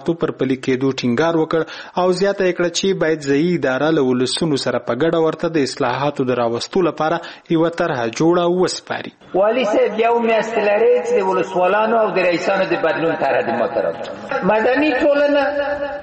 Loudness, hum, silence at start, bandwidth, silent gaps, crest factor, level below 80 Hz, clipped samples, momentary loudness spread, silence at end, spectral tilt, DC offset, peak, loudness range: -17 LUFS; none; 0 s; 8.8 kHz; none; 12 dB; -54 dBFS; under 0.1%; 6 LU; 0 s; -5 dB/octave; under 0.1%; -4 dBFS; 2 LU